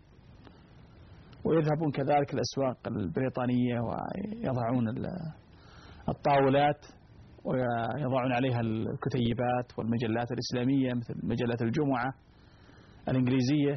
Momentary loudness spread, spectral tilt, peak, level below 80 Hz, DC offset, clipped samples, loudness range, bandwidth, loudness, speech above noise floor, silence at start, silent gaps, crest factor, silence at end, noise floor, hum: 10 LU; -6.5 dB/octave; -16 dBFS; -58 dBFS; under 0.1%; under 0.1%; 2 LU; 6.4 kHz; -30 LUFS; 27 dB; 0.3 s; none; 14 dB; 0 s; -56 dBFS; none